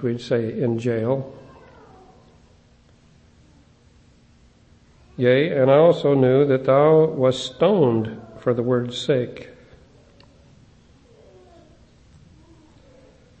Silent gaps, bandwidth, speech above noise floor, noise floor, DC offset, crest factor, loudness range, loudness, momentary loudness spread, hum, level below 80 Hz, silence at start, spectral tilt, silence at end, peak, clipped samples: none; 8.6 kHz; 35 dB; -54 dBFS; under 0.1%; 18 dB; 14 LU; -19 LUFS; 12 LU; none; -58 dBFS; 0 s; -7 dB/octave; 3.95 s; -4 dBFS; under 0.1%